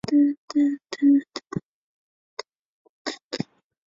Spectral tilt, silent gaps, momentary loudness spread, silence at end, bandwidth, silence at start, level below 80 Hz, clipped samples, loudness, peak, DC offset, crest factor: -5.5 dB/octave; 0.38-0.48 s, 1.65-2.37 s, 2.59-3.05 s, 3.24-3.31 s; 20 LU; 0.45 s; 7.6 kHz; 0.05 s; -66 dBFS; under 0.1%; -25 LUFS; -10 dBFS; under 0.1%; 16 dB